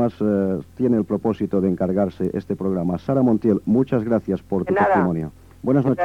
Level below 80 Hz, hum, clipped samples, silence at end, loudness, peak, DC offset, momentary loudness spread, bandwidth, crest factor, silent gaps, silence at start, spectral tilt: -50 dBFS; none; under 0.1%; 0 s; -21 LUFS; -6 dBFS; 0.1%; 7 LU; 7.4 kHz; 14 dB; none; 0 s; -10 dB/octave